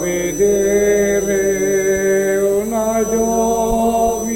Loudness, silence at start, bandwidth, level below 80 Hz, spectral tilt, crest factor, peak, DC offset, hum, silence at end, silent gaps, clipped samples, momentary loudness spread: -16 LUFS; 0 s; 16.5 kHz; -36 dBFS; -4.5 dB/octave; 12 dB; -4 dBFS; under 0.1%; none; 0 s; none; under 0.1%; 3 LU